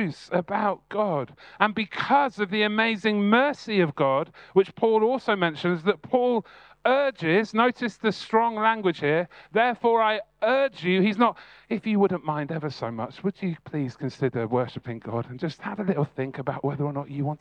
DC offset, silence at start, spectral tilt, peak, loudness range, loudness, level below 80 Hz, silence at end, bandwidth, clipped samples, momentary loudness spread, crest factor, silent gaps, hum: under 0.1%; 0 s; -7 dB/octave; -2 dBFS; 6 LU; -25 LUFS; -68 dBFS; 0.05 s; 9.2 kHz; under 0.1%; 9 LU; 22 dB; none; none